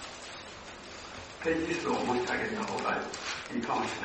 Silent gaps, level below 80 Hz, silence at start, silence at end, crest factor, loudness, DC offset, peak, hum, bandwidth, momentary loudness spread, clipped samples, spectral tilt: none; -60 dBFS; 0 s; 0 s; 18 dB; -33 LUFS; under 0.1%; -16 dBFS; none; 8.4 kHz; 13 LU; under 0.1%; -4 dB/octave